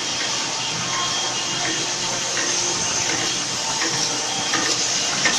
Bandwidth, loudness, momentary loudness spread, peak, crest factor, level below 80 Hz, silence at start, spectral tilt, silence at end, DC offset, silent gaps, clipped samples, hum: 13 kHz; -20 LUFS; 3 LU; -4 dBFS; 18 dB; -56 dBFS; 0 s; -0.5 dB/octave; 0 s; under 0.1%; none; under 0.1%; none